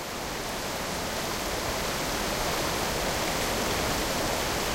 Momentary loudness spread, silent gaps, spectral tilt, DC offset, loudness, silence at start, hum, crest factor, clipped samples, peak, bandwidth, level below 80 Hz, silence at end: 4 LU; none; -2.5 dB/octave; under 0.1%; -28 LUFS; 0 s; none; 14 dB; under 0.1%; -14 dBFS; 16 kHz; -42 dBFS; 0 s